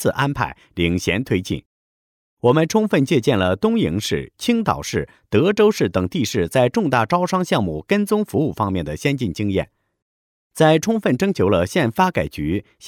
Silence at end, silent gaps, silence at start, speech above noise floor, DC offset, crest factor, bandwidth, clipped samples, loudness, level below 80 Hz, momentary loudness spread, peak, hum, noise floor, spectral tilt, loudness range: 0 s; 1.66-2.37 s, 10.02-10.50 s; 0 s; over 71 dB; under 0.1%; 16 dB; 19 kHz; under 0.1%; -19 LUFS; -48 dBFS; 8 LU; -2 dBFS; none; under -90 dBFS; -6 dB/octave; 2 LU